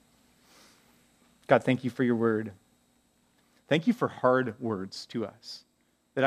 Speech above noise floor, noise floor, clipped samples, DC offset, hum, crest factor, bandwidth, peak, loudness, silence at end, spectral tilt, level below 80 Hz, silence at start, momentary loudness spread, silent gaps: 40 dB; -68 dBFS; under 0.1%; under 0.1%; none; 26 dB; 13.5 kHz; -4 dBFS; -28 LUFS; 0 s; -6.5 dB/octave; -76 dBFS; 1.5 s; 18 LU; none